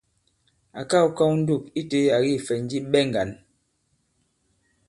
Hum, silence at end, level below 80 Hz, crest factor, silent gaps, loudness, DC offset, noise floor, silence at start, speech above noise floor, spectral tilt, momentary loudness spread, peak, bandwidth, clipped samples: none; 1.55 s; -60 dBFS; 18 dB; none; -23 LUFS; under 0.1%; -70 dBFS; 0.75 s; 48 dB; -6 dB/octave; 8 LU; -6 dBFS; 11.5 kHz; under 0.1%